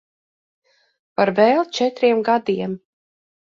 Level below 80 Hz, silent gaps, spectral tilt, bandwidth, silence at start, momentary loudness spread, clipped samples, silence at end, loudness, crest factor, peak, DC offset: -66 dBFS; none; -5.5 dB/octave; 7.6 kHz; 1.2 s; 13 LU; under 0.1%; 0.65 s; -19 LUFS; 20 dB; -2 dBFS; under 0.1%